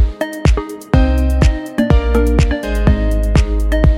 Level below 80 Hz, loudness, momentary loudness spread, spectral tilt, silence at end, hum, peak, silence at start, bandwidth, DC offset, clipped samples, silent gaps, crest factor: -14 dBFS; -15 LUFS; 4 LU; -7 dB/octave; 0 s; none; 0 dBFS; 0 s; 13.5 kHz; under 0.1%; under 0.1%; none; 12 dB